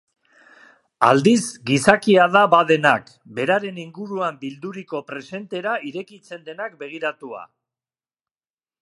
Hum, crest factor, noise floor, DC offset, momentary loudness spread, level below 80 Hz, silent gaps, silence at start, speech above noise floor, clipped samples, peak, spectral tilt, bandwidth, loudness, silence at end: none; 22 dB; under -90 dBFS; under 0.1%; 20 LU; -64 dBFS; none; 1 s; over 70 dB; under 0.1%; 0 dBFS; -5 dB/octave; 11.5 kHz; -19 LUFS; 1.4 s